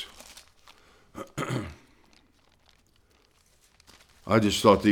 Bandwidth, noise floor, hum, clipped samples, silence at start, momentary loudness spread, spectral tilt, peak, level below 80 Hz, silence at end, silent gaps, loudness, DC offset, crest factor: 18.5 kHz; -63 dBFS; none; under 0.1%; 0 s; 27 LU; -5 dB/octave; -4 dBFS; -56 dBFS; 0 s; none; -25 LUFS; under 0.1%; 26 dB